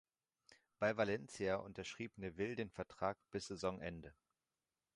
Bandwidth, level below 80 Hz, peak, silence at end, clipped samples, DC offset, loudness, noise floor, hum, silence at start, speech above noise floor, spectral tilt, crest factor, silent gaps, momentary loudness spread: 11 kHz; -68 dBFS; -24 dBFS; 0.85 s; under 0.1%; under 0.1%; -43 LUFS; under -90 dBFS; none; 0.5 s; over 47 dB; -5 dB/octave; 22 dB; none; 10 LU